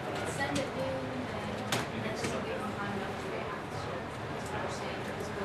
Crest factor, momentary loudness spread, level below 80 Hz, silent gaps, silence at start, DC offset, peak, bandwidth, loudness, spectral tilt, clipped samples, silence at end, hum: 18 dB; 5 LU; -54 dBFS; none; 0 s; under 0.1%; -18 dBFS; 13 kHz; -36 LUFS; -4.5 dB/octave; under 0.1%; 0 s; none